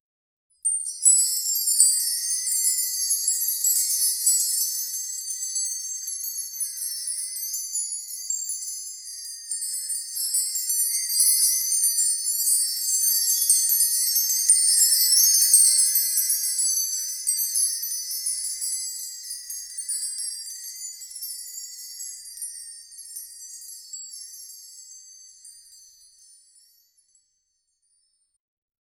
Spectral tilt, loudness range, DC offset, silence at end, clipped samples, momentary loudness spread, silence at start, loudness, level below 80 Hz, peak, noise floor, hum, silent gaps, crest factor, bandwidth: 8 dB/octave; 19 LU; under 0.1%; 3.25 s; under 0.1%; 19 LU; 0.65 s; -20 LUFS; -76 dBFS; -2 dBFS; -74 dBFS; none; none; 24 dB; over 20 kHz